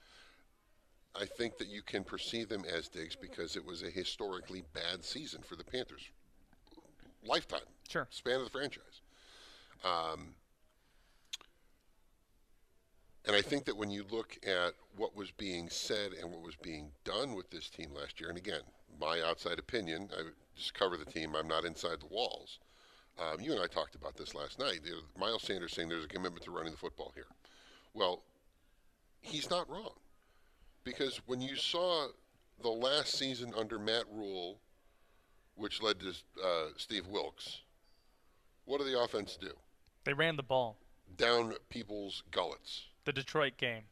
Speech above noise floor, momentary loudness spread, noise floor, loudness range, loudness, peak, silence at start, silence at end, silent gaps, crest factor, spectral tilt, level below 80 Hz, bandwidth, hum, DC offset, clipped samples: 31 dB; 14 LU; -70 dBFS; 6 LU; -39 LUFS; -14 dBFS; 0.1 s; 0.05 s; none; 28 dB; -3.5 dB/octave; -64 dBFS; 13.5 kHz; none; under 0.1%; under 0.1%